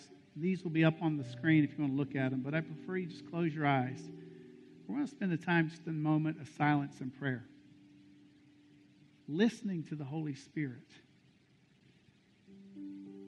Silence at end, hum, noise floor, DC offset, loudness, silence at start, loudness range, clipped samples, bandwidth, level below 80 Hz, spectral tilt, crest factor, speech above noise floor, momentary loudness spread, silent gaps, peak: 0 s; none; -67 dBFS; under 0.1%; -35 LUFS; 0 s; 6 LU; under 0.1%; 9.6 kHz; -78 dBFS; -7.5 dB/octave; 22 dB; 33 dB; 19 LU; none; -16 dBFS